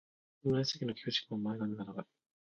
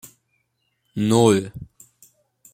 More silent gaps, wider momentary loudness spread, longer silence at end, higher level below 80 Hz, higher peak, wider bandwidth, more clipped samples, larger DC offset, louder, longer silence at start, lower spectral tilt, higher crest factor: neither; second, 12 LU vs 21 LU; second, 0.5 s vs 0.9 s; second, -72 dBFS vs -56 dBFS; second, -20 dBFS vs -2 dBFS; second, 7.4 kHz vs 16.5 kHz; neither; neither; second, -37 LUFS vs -19 LUFS; second, 0.45 s vs 0.95 s; about the same, -5 dB/octave vs -6 dB/octave; about the same, 18 dB vs 22 dB